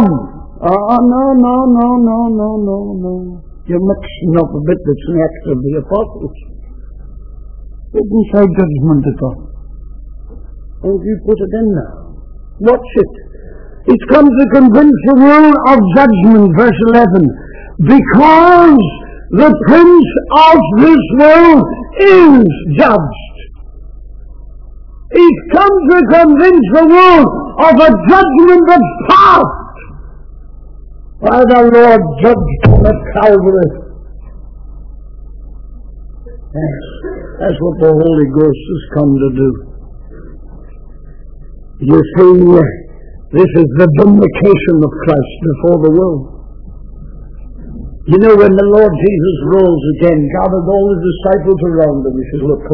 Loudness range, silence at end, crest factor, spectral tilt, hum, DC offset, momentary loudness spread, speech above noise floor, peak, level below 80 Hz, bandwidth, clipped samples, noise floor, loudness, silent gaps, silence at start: 10 LU; 0 s; 8 dB; -9.5 dB/octave; none; under 0.1%; 15 LU; 23 dB; 0 dBFS; -28 dBFS; 5.4 kHz; 3%; -30 dBFS; -8 LUFS; none; 0 s